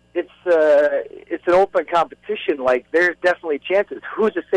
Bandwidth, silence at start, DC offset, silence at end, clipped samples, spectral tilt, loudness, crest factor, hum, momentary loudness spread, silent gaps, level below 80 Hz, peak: 10.5 kHz; 0.15 s; under 0.1%; 0 s; under 0.1%; -5 dB/octave; -19 LUFS; 12 dB; none; 11 LU; none; -58 dBFS; -8 dBFS